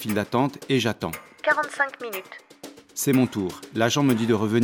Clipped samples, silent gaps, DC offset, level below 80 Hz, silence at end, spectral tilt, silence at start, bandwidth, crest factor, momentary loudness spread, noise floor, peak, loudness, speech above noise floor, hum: under 0.1%; none; under 0.1%; -62 dBFS; 0 s; -5 dB/octave; 0 s; 17 kHz; 20 dB; 15 LU; -45 dBFS; -4 dBFS; -24 LUFS; 21 dB; none